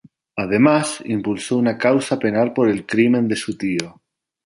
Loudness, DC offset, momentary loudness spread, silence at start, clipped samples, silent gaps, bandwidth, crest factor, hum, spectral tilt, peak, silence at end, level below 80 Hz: -19 LUFS; under 0.1%; 8 LU; 0.35 s; under 0.1%; none; 11.5 kHz; 18 dB; none; -5.5 dB/octave; -2 dBFS; 0.55 s; -58 dBFS